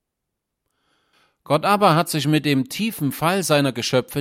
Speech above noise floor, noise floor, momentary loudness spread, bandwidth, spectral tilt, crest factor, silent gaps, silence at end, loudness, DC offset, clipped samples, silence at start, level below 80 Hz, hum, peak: 61 dB; -80 dBFS; 7 LU; 16.5 kHz; -5 dB/octave; 18 dB; none; 0 s; -20 LUFS; under 0.1%; under 0.1%; 1.5 s; -60 dBFS; none; -4 dBFS